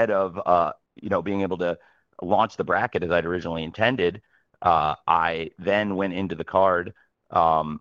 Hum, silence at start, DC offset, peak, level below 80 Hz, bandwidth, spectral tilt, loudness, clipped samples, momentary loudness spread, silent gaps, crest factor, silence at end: none; 0 s; under 0.1%; -4 dBFS; -54 dBFS; 7.4 kHz; -7 dB/octave; -24 LUFS; under 0.1%; 8 LU; none; 20 dB; 0 s